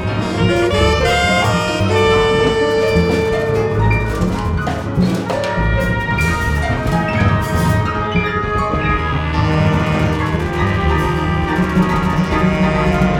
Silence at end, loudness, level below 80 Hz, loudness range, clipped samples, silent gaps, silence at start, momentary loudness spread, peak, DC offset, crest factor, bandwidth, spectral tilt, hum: 0 s; -16 LUFS; -26 dBFS; 3 LU; under 0.1%; none; 0 s; 4 LU; -2 dBFS; under 0.1%; 14 dB; 18 kHz; -6 dB/octave; none